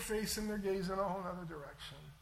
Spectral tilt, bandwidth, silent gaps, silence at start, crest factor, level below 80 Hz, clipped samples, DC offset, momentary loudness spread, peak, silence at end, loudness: -4.5 dB/octave; 16.5 kHz; none; 0 s; 14 dB; -56 dBFS; under 0.1%; under 0.1%; 12 LU; -26 dBFS; 0 s; -40 LUFS